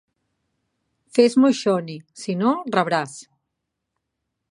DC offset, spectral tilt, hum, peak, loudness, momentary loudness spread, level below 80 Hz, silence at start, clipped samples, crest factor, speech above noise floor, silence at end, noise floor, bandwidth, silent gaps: under 0.1%; -5.5 dB/octave; none; -2 dBFS; -20 LUFS; 17 LU; -76 dBFS; 1.15 s; under 0.1%; 20 dB; 60 dB; 1.3 s; -80 dBFS; 11 kHz; none